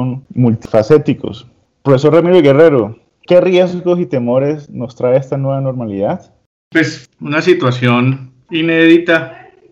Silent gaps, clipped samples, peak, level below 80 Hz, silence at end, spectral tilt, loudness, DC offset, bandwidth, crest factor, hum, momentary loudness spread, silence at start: 6.46-6.71 s; under 0.1%; 0 dBFS; -52 dBFS; 0.35 s; -7.5 dB/octave; -12 LUFS; under 0.1%; 7.8 kHz; 12 dB; none; 13 LU; 0 s